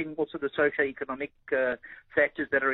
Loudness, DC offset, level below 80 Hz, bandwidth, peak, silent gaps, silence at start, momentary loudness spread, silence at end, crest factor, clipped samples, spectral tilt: -29 LUFS; under 0.1%; -64 dBFS; 4.1 kHz; -10 dBFS; none; 0 s; 9 LU; 0 s; 20 dB; under 0.1%; -8.5 dB/octave